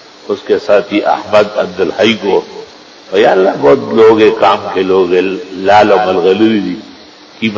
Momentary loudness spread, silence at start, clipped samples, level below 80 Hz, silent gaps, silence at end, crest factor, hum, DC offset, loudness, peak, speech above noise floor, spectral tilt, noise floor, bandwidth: 11 LU; 0.25 s; 0.6%; -48 dBFS; none; 0 s; 10 dB; none; under 0.1%; -10 LUFS; 0 dBFS; 26 dB; -5.5 dB/octave; -36 dBFS; 7.6 kHz